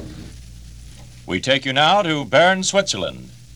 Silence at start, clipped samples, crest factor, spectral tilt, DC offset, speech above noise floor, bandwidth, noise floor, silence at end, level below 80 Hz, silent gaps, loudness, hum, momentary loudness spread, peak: 0 s; under 0.1%; 18 dB; -3 dB/octave; 0.3%; 22 dB; 19 kHz; -40 dBFS; 0 s; -44 dBFS; none; -17 LUFS; none; 19 LU; -2 dBFS